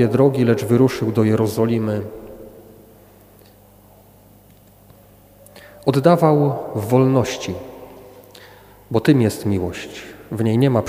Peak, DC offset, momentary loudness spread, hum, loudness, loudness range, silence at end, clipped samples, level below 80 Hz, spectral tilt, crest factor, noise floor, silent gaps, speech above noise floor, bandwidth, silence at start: 0 dBFS; under 0.1%; 19 LU; 50 Hz at -55 dBFS; -18 LUFS; 8 LU; 0 s; under 0.1%; -52 dBFS; -7.5 dB/octave; 20 dB; -49 dBFS; none; 32 dB; 16.5 kHz; 0 s